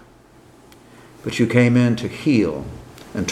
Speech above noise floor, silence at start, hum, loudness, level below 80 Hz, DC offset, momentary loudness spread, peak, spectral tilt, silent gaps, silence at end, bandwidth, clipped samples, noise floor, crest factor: 31 dB; 1.25 s; none; -18 LUFS; -48 dBFS; under 0.1%; 18 LU; 0 dBFS; -6.5 dB/octave; none; 0 s; 13 kHz; under 0.1%; -49 dBFS; 20 dB